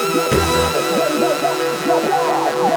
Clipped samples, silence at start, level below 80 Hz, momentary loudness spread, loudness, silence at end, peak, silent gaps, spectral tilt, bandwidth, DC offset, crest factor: under 0.1%; 0 s; -38 dBFS; 2 LU; -17 LUFS; 0 s; -2 dBFS; none; -4 dB/octave; over 20 kHz; under 0.1%; 14 dB